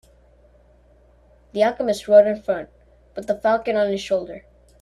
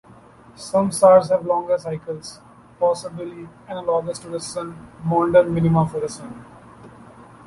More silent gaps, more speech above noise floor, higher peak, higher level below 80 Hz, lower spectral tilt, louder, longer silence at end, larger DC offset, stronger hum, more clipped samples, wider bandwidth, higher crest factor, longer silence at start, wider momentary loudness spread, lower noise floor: neither; first, 34 dB vs 27 dB; about the same, -2 dBFS vs -2 dBFS; about the same, -54 dBFS vs -52 dBFS; second, -5 dB/octave vs -6.5 dB/octave; about the same, -20 LUFS vs -20 LUFS; second, 0.4 s vs 0.6 s; neither; first, 60 Hz at -55 dBFS vs none; neither; about the same, 12 kHz vs 11.5 kHz; about the same, 20 dB vs 20 dB; first, 1.55 s vs 0.6 s; about the same, 22 LU vs 20 LU; first, -54 dBFS vs -47 dBFS